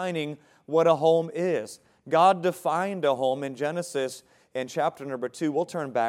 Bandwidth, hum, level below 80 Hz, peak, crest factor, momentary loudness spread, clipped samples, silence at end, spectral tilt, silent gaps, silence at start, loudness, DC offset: 15.5 kHz; none; -80 dBFS; -6 dBFS; 20 dB; 14 LU; under 0.1%; 0 s; -5.5 dB/octave; none; 0 s; -26 LUFS; under 0.1%